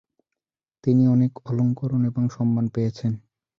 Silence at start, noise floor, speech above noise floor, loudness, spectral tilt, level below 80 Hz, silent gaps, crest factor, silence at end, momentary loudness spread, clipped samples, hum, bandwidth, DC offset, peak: 0.85 s; -90 dBFS; 69 dB; -23 LUFS; -10 dB/octave; -58 dBFS; none; 14 dB; 0.4 s; 10 LU; under 0.1%; none; 6.8 kHz; under 0.1%; -8 dBFS